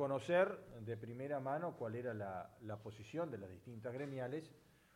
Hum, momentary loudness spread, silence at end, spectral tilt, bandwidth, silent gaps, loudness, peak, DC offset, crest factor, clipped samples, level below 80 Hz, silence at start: none; 15 LU; 0.35 s; -7 dB/octave; 16 kHz; none; -43 LUFS; -24 dBFS; under 0.1%; 20 dB; under 0.1%; -78 dBFS; 0 s